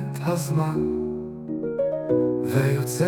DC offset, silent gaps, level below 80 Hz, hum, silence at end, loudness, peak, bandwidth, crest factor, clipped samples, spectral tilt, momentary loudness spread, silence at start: under 0.1%; none; -54 dBFS; none; 0 s; -25 LUFS; -10 dBFS; 19 kHz; 14 dB; under 0.1%; -7 dB/octave; 8 LU; 0 s